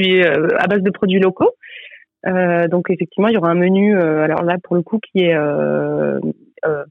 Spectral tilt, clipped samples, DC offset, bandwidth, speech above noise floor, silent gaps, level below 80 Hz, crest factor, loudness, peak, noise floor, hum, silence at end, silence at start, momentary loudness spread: -9 dB/octave; under 0.1%; under 0.1%; 4.3 kHz; 24 dB; none; -62 dBFS; 12 dB; -16 LUFS; -4 dBFS; -39 dBFS; none; 0.05 s; 0 s; 9 LU